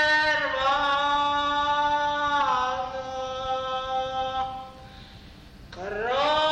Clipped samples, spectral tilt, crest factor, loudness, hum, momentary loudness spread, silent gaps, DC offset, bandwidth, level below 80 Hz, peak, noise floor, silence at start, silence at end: under 0.1%; -3 dB/octave; 14 dB; -25 LUFS; none; 16 LU; none; under 0.1%; 9.4 kHz; -50 dBFS; -12 dBFS; -46 dBFS; 0 s; 0 s